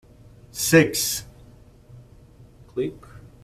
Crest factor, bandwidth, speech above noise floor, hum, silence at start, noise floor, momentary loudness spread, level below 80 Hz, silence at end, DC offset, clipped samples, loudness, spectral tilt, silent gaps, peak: 24 dB; 15 kHz; 28 dB; none; 0.55 s; -49 dBFS; 16 LU; -52 dBFS; 0.25 s; under 0.1%; under 0.1%; -22 LUFS; -4 dB/octave; none; -2 dBFS